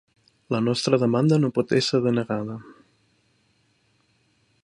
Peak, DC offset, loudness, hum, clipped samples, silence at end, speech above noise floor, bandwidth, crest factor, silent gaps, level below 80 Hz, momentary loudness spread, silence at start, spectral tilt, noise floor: -6 dBFS; under 0.1%; -23 LUFS; none; under 0.1%; 1.9 s; 44 dB; 11 kHz; 20 dB; none; -64 dBFS; 10 LU; 0.5 s; -6 dB/octave; -66 dBFS